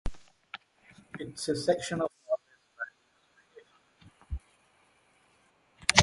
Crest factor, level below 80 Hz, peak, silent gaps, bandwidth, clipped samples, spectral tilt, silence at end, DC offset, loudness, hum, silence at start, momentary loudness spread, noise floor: 32 dB; -50 dBFS; -2 dBFS; none; 11.5 kHz; under 0.1%; -3 dB/octave; 0 s; under 0.1%; -33 LUFS; none; 0.05 s; 18 LU; -68 dBFS